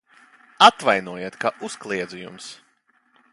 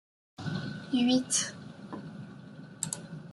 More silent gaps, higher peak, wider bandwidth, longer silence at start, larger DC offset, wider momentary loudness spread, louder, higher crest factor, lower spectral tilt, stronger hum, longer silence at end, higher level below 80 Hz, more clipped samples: neither; first, 0 dBFS vs -14 dBFS; about the same, 11.5 kHz vs 12 kHz; first, 0.6 s vs 0.4 s; neither; about the same, 22 LU vs 20 LU; first, -19 LUFS vs -31 LUFS; about the same, 24 dB vs 20 dB; about the same, -2.5 dB/octave vs -3.5 dB/octave; neither; first, 0.8 s vs 0 s; about the same, -68 dBFS vs -70 dBFS; neither